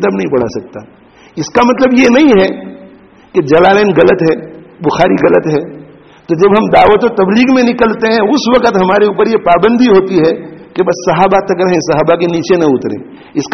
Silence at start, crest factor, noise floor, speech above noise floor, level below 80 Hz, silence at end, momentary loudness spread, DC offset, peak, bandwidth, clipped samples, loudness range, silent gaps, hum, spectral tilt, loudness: 0 s; 10 dB; -38 dBFS; 29 dB; -42 dBFS; 0 s; 13 LU; under 0.1%; 0 dBFS; 6.4 kHz; 0.1%; 2 LU; none; none; -6 dB/octave; -9 LUFS